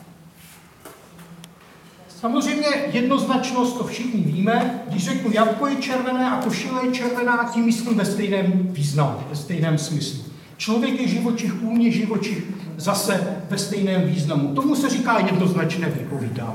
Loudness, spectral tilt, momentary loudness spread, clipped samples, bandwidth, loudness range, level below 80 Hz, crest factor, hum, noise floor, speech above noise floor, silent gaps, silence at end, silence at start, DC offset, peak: -22 LUFS; -5.5 dB/octave; 7 LU; under 0.1%; 16.5 kHz; 2 LU; -62 dBFS; 18 dB; none; -47 dBFS; 26 dB; none; 0 s; 0 s; under 0.1%; -4 dBFS